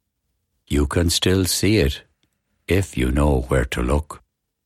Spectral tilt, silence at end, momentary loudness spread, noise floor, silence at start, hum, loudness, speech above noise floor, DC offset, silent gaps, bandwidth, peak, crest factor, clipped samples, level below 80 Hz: -5 dB/octave; 0.5 s; 13 LU; -74 dBFS; 0.7 s; none; -20 LUFS; 55 dB; under 0.1%; none; 15.5 kHz; -6 dBFS; 16 dB; under 0.1%; -28 dBFS